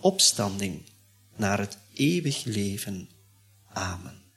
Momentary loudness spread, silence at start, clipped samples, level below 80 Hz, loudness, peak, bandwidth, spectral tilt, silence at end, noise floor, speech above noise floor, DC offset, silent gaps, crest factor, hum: 18 LU; 0 s; under 0.1%; -62 dBFS; -27 LUFS; -8 dBFS; 16 kHz; -3.5 dB/octave; 0.2 s; -59 dBFS; 32 dB; under 0.1%; none; 22 dB; none